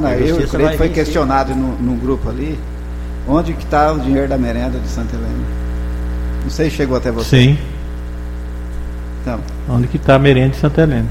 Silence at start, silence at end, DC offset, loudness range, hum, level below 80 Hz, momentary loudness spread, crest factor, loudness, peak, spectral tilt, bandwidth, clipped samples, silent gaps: 0 s; 0 s; under 0.1%; 2 LU; 60 Hz at -20 dBFS; -22 dBFS; 15 LU; 16 dB; -16 LUFS; 0 dBFS; -7 dB/octave; 15.5 kHz; under 0.1%; none